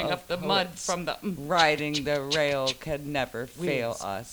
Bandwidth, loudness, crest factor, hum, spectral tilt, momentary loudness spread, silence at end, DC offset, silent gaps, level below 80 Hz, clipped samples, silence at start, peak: over 20 kHz; -27 LUFS; 22 dB; none; -3.5 dB/octave; 10 LU; 0 s; under 0.1%; none; -54 dBFS; under 0.1%; 0 s; -6 dBFS